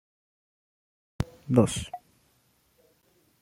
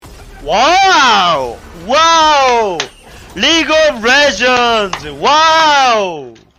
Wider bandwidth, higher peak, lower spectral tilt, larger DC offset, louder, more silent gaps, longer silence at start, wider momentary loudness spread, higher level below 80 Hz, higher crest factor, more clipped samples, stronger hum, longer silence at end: about the same, 16 kHz vs 16 kHz; second, -6 dBFS vs -2 dBFS; first, -6 dB/octave vs -1.5 dB/octave; neither; second, -27 LUFS vs -10 LUFS; neither; first, 1.2 s vs 0.05 s; first, 18 LU vs 14 LU; second, -52 dBFS vs -40 dBFS; first, 26 dB vs 10 dB; neither; neither; first, 1.45 s vs 0.3 s